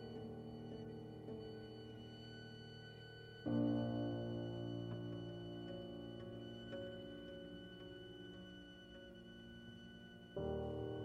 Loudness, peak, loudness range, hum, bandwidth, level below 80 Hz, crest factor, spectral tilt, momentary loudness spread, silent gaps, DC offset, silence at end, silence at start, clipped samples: -48 LUFS; -28 dBFS; 9 LU; none; 8 kHz; -68 dBFS; 20 dB; -8 dB/octave; 14 LU; none; under 0.1%; 0 s; 0 s; under 0.1%